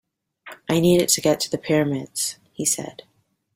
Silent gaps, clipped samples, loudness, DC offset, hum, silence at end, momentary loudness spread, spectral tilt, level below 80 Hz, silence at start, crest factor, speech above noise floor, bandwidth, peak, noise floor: none; under 0.1%; -21 LUFS; under 0.1%; none; 0.65 s; 9 LU; -4 dB/octave; -58 dBFS; 0.45 s; 20 dB; 24 dB; 16.5 kHz; -4 dBFS; -45 dBFS